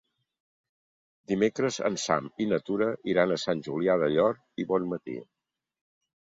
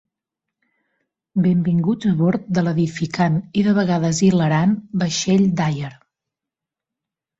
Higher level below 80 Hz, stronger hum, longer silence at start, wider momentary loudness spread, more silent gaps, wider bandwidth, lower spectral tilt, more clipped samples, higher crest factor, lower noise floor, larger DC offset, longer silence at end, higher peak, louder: second, -68 dBFS vs -56 dBFS; neither; about the same, 1.3 s vs 1.35 s; first, 9 LU vs 5 LU; neither; about the same, 7.8 kHz vs 8 kHz; about the same, -5 dB/octave vs -6 dB/octave; neither; about the same, 20 dB vs 16 dB; first, under -90 dBFS vs -86 dBFS; neither; second, 1.05 s vs 1.45 s; second, -10 dBFS vs -4 dBFS; second, -28 LUFS vs -19 LUFS